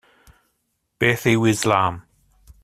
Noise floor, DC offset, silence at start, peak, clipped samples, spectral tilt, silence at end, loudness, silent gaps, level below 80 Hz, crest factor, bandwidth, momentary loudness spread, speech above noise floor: -72 dBFS; under 0.1%; 1 s; -2 dBFS; under 0.1%; -5 dB/octave; 0.65 s; -19 LUFS; none; -52 dBFS; 20 dB; 15.5 kHz; 6 LU; 54 dB